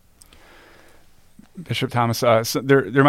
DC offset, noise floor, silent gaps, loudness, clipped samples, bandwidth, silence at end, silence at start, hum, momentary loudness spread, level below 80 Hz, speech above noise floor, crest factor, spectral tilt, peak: under 0.1%; -50 dBFS; none; -20 LUFS; under 0.1%; 16.5 kHz; 0 s; 1.55 s; none; 10 LU; -56 dBFS; 31 dB; 20 dB; -5.5 dB/octave; -2 dBFS